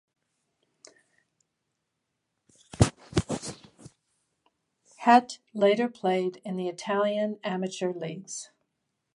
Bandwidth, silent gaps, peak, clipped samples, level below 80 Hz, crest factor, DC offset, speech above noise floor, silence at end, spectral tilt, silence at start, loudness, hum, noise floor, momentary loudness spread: 11.5 kHz; none; -4 dBFS; under 0.1%; -50 dBFS; 26 dB; under 0.1%; 55 dB; 0.7 s; -5.5 dB/octave; 2.75 s; -27 LUFS; none; -81 dBFS; 18 LU